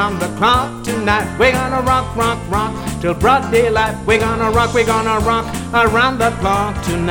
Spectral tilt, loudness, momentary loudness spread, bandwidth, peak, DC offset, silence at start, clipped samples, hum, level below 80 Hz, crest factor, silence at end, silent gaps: -5 dB/octave; -15 LUFS; 6 LU; 19 kHz; 0 dBFS; under 0.1%; 0 s; under 0.1%; none; -30 dBFS; 14 dB; 0 s; none